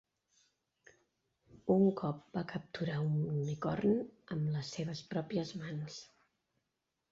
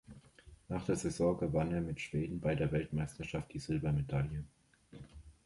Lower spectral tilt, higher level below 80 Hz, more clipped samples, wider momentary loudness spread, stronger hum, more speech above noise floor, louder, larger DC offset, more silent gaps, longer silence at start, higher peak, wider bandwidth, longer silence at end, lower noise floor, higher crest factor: about the same, -7 dB/octave vs -7 dB/octave; second, -70 dBFS vs -52 dBFS; neither; second, 12 LU vs 17 LU; neither; first, 51 dB vs 24 dB; about the same, -36 LUFS vs -37 LUFS; neither; neither; first, 1.55 s vs 0.1 s; about the same, -18 dBFS vs -20 dBFS; second, 7.6 kHz vs 11.5 kHz; first, 1.05 s vs 0.15 s; first, -86 dBFS vs -60 dBFS; about the same, 20 dB vs 18 dB